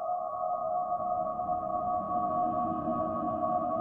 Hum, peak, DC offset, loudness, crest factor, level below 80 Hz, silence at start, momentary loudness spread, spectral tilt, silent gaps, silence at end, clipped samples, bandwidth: none; -18 dBFS; under 0.1%; -32 LUFS; 14 dB; -60 dBFS; 0 s; 3 LU; -11 dB/octave; none; 0 s; under 0.1%; 3.2 kHz